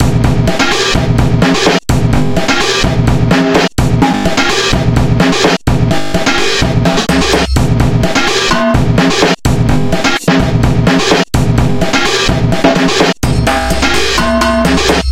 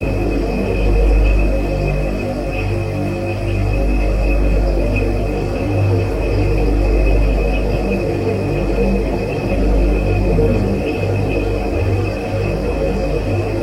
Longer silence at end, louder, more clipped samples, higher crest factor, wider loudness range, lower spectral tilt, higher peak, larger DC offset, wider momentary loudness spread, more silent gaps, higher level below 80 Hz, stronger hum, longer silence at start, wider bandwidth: about the same, 0 s vs 0 s; first, -10 LUFS vs -18 LUFS; neither; about the same, 10 dB vs 12 dB; about the same, 0 LU vs 1 LU; second, -5 dB/octave vs -8 dB/octave; first, 0 dBFS vs -4 dBFS; first, 5% vs under 0.1%; about the same, 2 LU vs 4 LU; neither; about the same, -20 dBFS vs -18 dBFS; neither; about the same, 0 s vs 0 s; first, 16.5 kHz vs 10.5 kHz